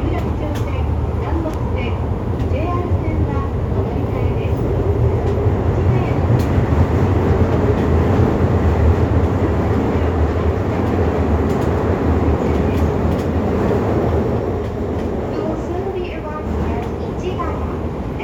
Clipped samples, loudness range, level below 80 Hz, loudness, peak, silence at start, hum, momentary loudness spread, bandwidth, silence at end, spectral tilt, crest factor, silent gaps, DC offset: under 0.1%; 5 LU; -26 dBFS; -18 LUFS; -2 dBFS; 0 s; none; 6 LU; 7.8 kHz; 0 s; -9 dB/octave; 16 dB; none; under 0.1%